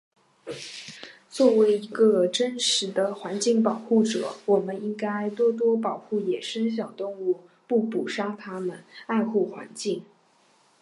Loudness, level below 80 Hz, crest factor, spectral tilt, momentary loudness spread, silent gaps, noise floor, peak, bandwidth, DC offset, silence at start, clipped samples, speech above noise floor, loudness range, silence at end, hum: -25 LUFS; -80 dBFS; 18 dB; -4 dB/octave; 15 LU; none; -62 dBFS; -8 dBFS; 11.5 kHz; under 0.1%; 0.45 s; under 0.1%; 37 dB; 6 LU; 0.8 s; none